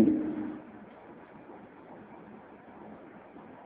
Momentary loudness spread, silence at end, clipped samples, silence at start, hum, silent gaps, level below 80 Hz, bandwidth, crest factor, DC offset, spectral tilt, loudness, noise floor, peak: 16 LU; 0 s; under 0.1%; 0 s; none; none; -68 dBFS; 3.7 kHz; 22 dB; under 0.1%; -8.5 dB/octave; -35 LUFS; -51 dBFS; -12 dBFS